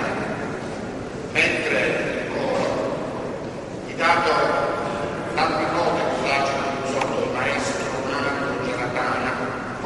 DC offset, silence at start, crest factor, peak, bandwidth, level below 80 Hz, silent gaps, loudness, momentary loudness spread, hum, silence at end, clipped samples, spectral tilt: under 0.1%; 0 s; 18 dB; -4 dBFS; 11.5 kHz; -50 dBFS; none; -23 LUFS; 10 LU; none; 0 s; under 0.1%; -4.5 dB/octave